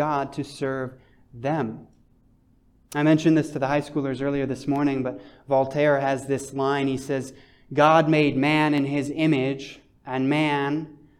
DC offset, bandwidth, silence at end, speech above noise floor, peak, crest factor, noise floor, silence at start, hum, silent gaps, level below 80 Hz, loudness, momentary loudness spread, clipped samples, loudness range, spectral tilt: under 0.1%; 12.5 kHz; 0.25 s; 36 dB; -4 dBFS; 20 dB; -59 dBFS; 0 s; none; none; -58 dBFS; -23 LUFS; 13 LU; under 0.1%; 4 LU; -6.5 dB/octave